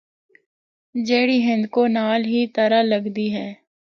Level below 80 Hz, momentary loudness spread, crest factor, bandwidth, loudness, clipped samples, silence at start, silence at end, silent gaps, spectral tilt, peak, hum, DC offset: -70 dBFS; 10 LU; 16 dB; 6.8 kHz; -20 LUFS; under 0.1%; 0.95 s; 0.45 s; none; -6 dB/octave; -6 dBFS; none; under 0.1%